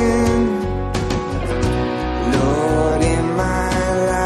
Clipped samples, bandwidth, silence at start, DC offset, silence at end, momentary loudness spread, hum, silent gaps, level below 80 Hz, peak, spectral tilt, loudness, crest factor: under 0.1%; 13.5 kHz; 0 s; under 0.1%; 0 s; 5 LU; none; none; -26 dBFS; -4 dBFS; -6 dB/octave; -19 LUFS; 14 dB